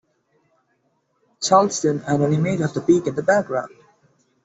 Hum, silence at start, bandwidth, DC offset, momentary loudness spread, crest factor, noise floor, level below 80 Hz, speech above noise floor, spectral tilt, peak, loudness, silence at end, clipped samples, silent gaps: none; 1.4 s; 8.2 kHz; under 0.1%; 10 LU; 18 dB; -68 dBFS; -62 dBFS; 49 dB; -5.5 dB/octave; -4 dBFS; -20 LUFS; 0.8 s; under 0.1%; none